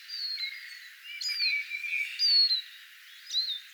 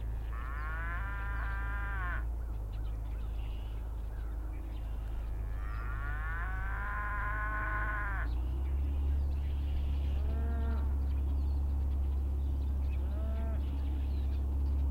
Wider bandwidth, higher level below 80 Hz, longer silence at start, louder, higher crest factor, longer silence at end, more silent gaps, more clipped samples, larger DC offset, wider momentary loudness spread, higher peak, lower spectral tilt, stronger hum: first, over 20 kHz vs 4.5 kHz; second, under -90 dBFS vs -34 dBFS; about the same, 0 s vs 0 s; first, -27 LUFS vs -37 LUFS; first, 16 dB vs 10 dB; about the same, 0 s vs 0 s; neither; neither; neither; first, 22 LU vs 7 LU; first, -16 dBFS vs -24 dBFS; second, 12 dB/octave vs -8 dB/octave; neither